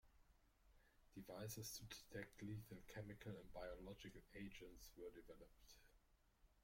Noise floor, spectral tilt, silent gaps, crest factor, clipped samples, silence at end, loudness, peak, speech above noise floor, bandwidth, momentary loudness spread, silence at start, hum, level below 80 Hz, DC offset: -77 dBFS; -4.5 dB/octave; none; 20 dB; under 0.1%; 0 s; -57 LUFS; -38 dBFS; 20 dB; 16.5 kHz; 12 LU; 0.05 s; none; -70 dBFS; under 0.1%